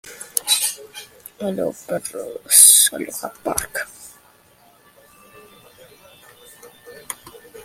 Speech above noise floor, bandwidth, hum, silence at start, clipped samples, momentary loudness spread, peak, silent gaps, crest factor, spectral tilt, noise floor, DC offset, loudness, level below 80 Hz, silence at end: 33 dB; 16.5 kHz; none; 0.05 s; under 0.1%; 25 LU; 0 dBFS; none; 22 dB; 0 dB/octave; -53 dBFS; under 0.1%; -15 LUFS; -56 dBFS; 0 s